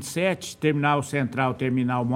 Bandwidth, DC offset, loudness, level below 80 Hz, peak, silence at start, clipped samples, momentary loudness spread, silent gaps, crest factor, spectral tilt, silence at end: 16 kHz; under 0.1%; -24 LUFS; -62 dBFS; -8 dBFS; 0 s; under 0.1%; 3 LU; none; 16 dB; -6 dB/octave; 0 s